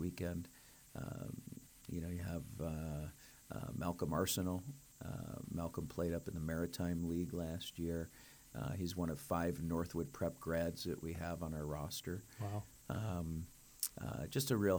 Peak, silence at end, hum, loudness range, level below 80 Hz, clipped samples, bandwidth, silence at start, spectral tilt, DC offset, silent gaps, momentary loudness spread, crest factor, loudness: -18 dBFS; 0 s; none; 3 LU; -58 dBFS; under 0.1%; over 20 kHz; 0 s; -5.5 dB/octave; under 0.1%; none; 12 LU; 24 dB; -43 LUFS